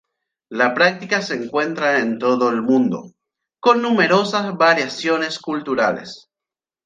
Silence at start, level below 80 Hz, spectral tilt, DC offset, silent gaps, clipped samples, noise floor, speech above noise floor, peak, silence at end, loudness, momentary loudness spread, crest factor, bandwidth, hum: 0.5 s; -68 dBFS; -4.5 dB/octave; under 0.1%; none; under 0.1%; -89 dBFS; 71 dB; -2 dBFS; 0.7 s; -18 LUFS; 8 LU; 18 dB; 9.2 kHz; none